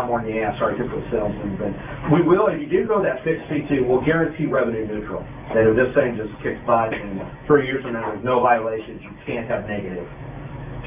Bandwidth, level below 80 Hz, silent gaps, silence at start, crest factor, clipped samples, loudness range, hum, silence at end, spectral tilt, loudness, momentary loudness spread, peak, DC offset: 3.7 kHz; -44 dBFS; none; 0 s; 18 dB; under 0.1%; 2 LU; none; 0 s; -11 dB/octave; -21 LUFS; 14 LU; -4 dBFS; under 0.1%